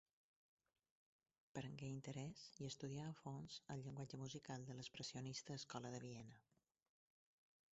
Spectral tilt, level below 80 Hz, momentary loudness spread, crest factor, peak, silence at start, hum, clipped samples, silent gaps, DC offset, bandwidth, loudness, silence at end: -5.5 dB/octave; -82 dBFS; 4 LU; 20 dB; -34 dBFS; 1.55 s; none; under 0.1%; none; under 0.1%; 8 kHz; -53 LUFS; 1.3 s